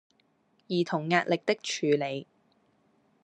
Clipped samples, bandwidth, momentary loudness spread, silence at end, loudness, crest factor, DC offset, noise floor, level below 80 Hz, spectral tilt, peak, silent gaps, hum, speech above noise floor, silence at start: under 0.1%; 10.5 kHz; 7 LU; 1 s; -29 LUFS; 22 dB; under 0.1%; -69 dBFS; -80 dBFS; -5 dB/octave; -10 dBFS; none; none; 41 dB; 0.7 s